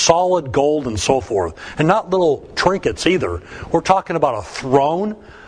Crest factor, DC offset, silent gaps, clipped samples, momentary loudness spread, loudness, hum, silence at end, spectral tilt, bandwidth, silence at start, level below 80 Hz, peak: 18 dB; under 0.1%; none; under 0.1%; 7 LU; -18 LUFS; none; 0 s; -4.5 dB/octave; 10.5 kHz; 0 s; -42 dBFS; 0 dBFS